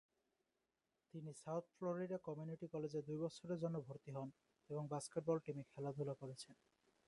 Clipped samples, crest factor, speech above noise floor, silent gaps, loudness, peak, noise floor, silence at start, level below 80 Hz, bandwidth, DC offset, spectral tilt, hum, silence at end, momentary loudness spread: under 0.1%; 20 dB; 43 dB; none; -48 LUFS; -28 dBFS; -90 dBFS; 1.15 s; -84 dBFS; 11.5 kHz; under 0.1%; -7 dB/octave; none; 0.55 s; 10 LU